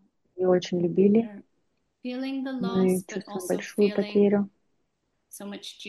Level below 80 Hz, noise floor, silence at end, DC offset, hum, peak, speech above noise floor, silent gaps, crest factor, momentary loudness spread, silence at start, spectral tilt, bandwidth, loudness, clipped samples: -70 dBFS; -76 dBFS; 0 s; under 0.1%; none; -10 dBFS; 51 dB; none; 18 dB; 16 LU; 0.35 s; -6.5 dB/octave; 12.5 kHz; -26 LUFS; under 0.1%